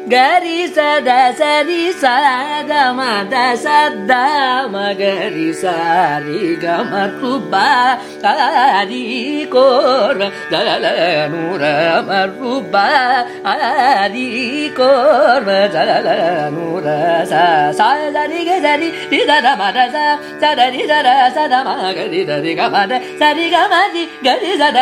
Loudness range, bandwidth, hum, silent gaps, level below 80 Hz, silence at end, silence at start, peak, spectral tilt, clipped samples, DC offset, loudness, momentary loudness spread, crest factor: 2 LU; 15 kHz; none; none; -64 dBFS; 0 s; 0 s; 0 dBFS; -4 dB/octave; under 0.1%; under 0.1%; -13 LUFS; 7 LU; 14 dB